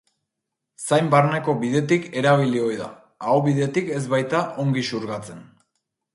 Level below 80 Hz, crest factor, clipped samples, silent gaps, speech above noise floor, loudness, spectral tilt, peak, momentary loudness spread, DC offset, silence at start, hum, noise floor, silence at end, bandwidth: -64 dBFS; 18 dB; under 0.1%; none; 61 dB; -21 LUFS; -6 dB/octave; -4 dBFS; 13 LU; under 0.1%; 0.8 s; none; -82 dBFS; 0.75 s; 11.5 kHz